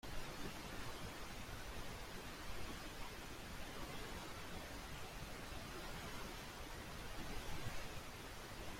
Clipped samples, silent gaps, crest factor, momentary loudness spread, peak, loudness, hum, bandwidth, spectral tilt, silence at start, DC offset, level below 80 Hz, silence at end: under 0.1%; none; 16 dB; 2 LU; -32 dBFS; -50 LUFS; none; 16.5 kHz; -3.5 dB/octave; 0.05 s; under 0.1%; -56 dBFS; 0 s